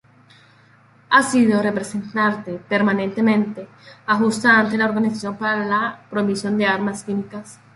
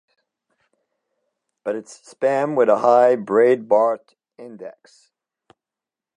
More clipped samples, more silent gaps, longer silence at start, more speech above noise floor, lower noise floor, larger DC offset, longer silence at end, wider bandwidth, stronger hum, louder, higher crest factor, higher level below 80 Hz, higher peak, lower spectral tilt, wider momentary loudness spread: neither; neither; second, 1.1 s vs 1.65 s; second, 33 dB vs 70 dB; second, -52 dBFS vs -88 dBFS; neither; second, 0.2 s vs 1.45 s; about the same, 11.5 kHz vs 10.5 kHz; neither; about the same, -19 LUFS vs -18 LUFS; about the same, 18 dB vs 20 dB; first, -64 dBFS vs -80 dBFS; about the same, -2 dBFS vs -2 dBFS; second, -5 dB/octave vs -6.5 dB/octave; second, 12 LU vs 22 LU